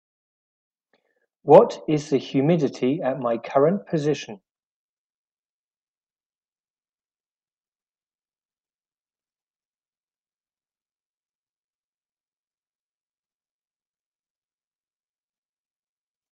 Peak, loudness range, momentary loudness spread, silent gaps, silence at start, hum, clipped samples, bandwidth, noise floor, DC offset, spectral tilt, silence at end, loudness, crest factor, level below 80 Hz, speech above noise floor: 0 dBFS; 11 LU; 12 LU; none; 1.45 s; none; under 0.1%; 8.4 kHz; under -90 dBFS; under 0.1%; -7 dB/octave; 11.95 s; -21 LUFS; 26 dB; -72 dBFS; over 70 dB